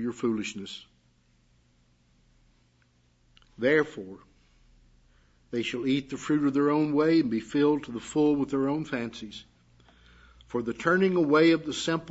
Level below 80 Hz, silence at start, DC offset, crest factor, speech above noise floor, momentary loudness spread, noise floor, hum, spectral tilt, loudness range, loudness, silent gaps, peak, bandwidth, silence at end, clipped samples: -62 dBFS; 0 s; under 0.1%; 18 dB; 39 dB; 16 LU; -66 dBFS; none; -5.5 dB/octave; 7 LU; -26 LUFS; none; -10 dBFS; 8 kHz; 0 s; under 0.1%